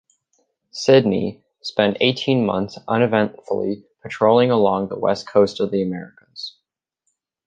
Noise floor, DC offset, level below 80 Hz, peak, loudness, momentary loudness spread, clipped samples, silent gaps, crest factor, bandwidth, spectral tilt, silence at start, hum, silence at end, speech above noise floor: -77 dBFS; under 0.1%; -58 dBFS; -2 dBFS; -19 LUFS; 18 LU; under 0.1%; none; 18 dB; 9 kHz; -6 dB/octave; 0.75 s; none; 1 s; 58 dB